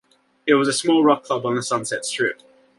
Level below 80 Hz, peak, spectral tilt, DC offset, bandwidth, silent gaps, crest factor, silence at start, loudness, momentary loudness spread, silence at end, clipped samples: -68 dBFS; -2 dBFS; -3.5 dB/octave; under 0.1%; 11.5 kHz; none; 18 dB; 0.45 s; -20 LUFS; 8 LU; 0.45 s; under 0.1%